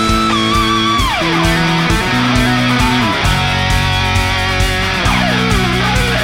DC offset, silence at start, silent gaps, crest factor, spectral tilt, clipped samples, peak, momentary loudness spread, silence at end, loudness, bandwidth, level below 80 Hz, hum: under 0.1%; 0 s; none; 12 dB; -4.5 dB/octave; under 0.1%; 0 dBFS; 1 LU; 0 s; -13 LUFS; 17.5 kHz; -22 dBFS; none